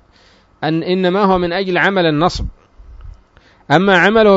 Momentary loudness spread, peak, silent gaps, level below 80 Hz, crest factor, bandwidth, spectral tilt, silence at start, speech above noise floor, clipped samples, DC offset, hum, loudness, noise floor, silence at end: 11 LU; 0 dBFS; none; -36 dBFS; 14 dB; 7.8 kHz; -6 dB/octave; 0.6 s; 37 dB; under 0.1%; under 0.1%; none; -14 LUFS; -50 dBFS; 0 s